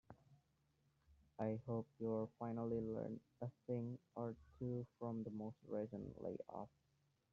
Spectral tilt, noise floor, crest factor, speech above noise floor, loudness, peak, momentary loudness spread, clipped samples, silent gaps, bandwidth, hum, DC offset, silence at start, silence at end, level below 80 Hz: -10.5 dB/octave; -82 dBFS; 18 dB; 35 dB; -48 LUFS; -30 dBFS; 9 LU; under 0.1%; none; 7 kHz; none; under 0.1%; 0.1 s; 0.65 s; -74 dBFS